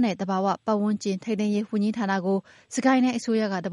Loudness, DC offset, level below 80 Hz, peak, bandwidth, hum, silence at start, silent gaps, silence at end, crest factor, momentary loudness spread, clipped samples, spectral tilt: -25 LUFS; under 0.1%; -72 dBFS; -10 dBFS; 11.5 kHz; none; 0 s; none; 0 s; 14 dB; 6 LU; under 0.1%; -6 dB/octave